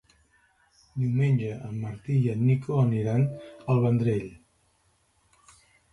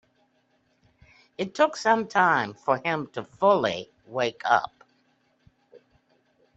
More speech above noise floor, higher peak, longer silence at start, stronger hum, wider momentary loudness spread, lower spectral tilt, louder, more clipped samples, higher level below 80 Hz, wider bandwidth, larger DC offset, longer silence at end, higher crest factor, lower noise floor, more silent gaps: about the same, 43 dB vs 44 dB; second, -12 dBFS vs -6 dBFS; second, 0.95 s vs 1.4 s; neither; second, 11 LU vs 14 LU; first, -9.5 dB/octave vs -4.5 dB/octave; about the same, -26 LUFS vs -25 LUFS; neither; first, -58 dBFS vs -70 dBFS; first, 11 kHz vs 8.2 kHz; neither; second, 1.55 s vs 1.9 s; second, 14 dB vs 22 dB; about the same, -68 dBFS vs -68 dBFS; neither